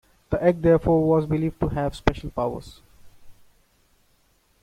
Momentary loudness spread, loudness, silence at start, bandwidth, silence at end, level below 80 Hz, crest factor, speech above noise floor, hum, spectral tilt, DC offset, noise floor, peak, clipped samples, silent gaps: 10 LU; -23 LUFS; 0.3 s; 13 kHz; 1.3 s; -40 dBFS; 22 dB; 41 dB; none; -8.5 dB/octave; under 0.1%; -63 dBFS; -2 dBFS; under 0.1%; none